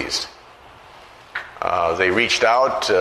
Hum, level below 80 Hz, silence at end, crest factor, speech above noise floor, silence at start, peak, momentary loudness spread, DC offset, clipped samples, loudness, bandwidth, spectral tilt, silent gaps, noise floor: none; -52 dBFS; 0 s; 18 dB; 27 dB; 0 s; -2 dBFS; 16 LU; under 0.1%; under 0.1%; -18 LUFS; 13.5 kHz; -2.5 dB/octave; none; -45 dBFS